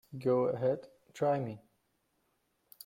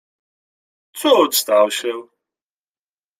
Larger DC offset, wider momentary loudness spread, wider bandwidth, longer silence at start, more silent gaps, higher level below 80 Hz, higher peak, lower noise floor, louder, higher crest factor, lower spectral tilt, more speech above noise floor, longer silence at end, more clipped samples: neither; about the same, 17 LU vs 16 LU; about the same, 16.5 kHz vs 16 kHz; second, 0.1 s vs 0.95 s; neither; about the same, -74 dBFS vs -72 dBFS; second, -18 dBFS vs -2 dBFS; second, -77 dBFS vs under -90 dBFS; second, -33 LUFS vs -16 LUFS; about the same, 16 dB vs 18 dB; first, -8 dB/octave vs -1.5 dB/octave; second, 45 dB vs over 74 dB; about the same, 1.25 s vs 1.15 s; neither